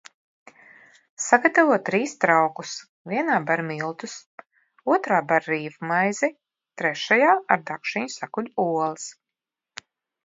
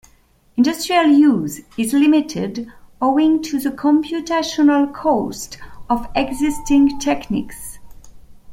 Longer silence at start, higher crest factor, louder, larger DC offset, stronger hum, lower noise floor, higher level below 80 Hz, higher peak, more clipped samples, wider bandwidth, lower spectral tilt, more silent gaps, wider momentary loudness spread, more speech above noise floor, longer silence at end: first, 1.2 s vs 0.55 s; first, 24 dB vs 16 dB; second, -23 LUFS vs -17 LUFS; neither; neither; first, -88 dBFS vs -54 dBFS; second, -76 dBFS vs -42 dBFS; about the same, 0 dBFS vs -2 dBFS; neither; second, 7.8 kHz vs 16.5 kHz; about the same, -4 dB/octave vs -4.5 dB/octave; first, 2.89-3.05 s, 4.26-4.38 s vs none; about the same, 18 LU vs 16 LU; first, 65 dB vs 37 dB; first, 1.15 s vs 0 s